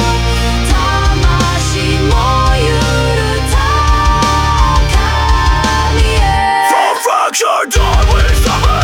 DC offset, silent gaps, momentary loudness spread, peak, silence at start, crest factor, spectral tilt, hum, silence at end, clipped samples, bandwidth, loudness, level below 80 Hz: under 0.1%; none; 2 LU; 0 dBFS; 0 s; 10 dB; -4.5 dB/octave; none; 0 s; under 0.1%; 17 kHz; -11 LUFS; -14 dBFS